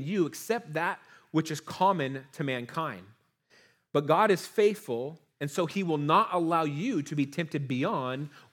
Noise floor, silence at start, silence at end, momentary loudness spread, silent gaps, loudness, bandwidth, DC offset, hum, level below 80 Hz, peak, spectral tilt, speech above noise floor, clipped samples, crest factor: -64 dBFS; 0 s; 0.15 s; 11 LU; none; -29 LUFS; 19 kHz; under 0.1%; none; -82 dBFS; -8 dBFS; -6 dB/octave; 35 dB; under 0.1%; 20 dB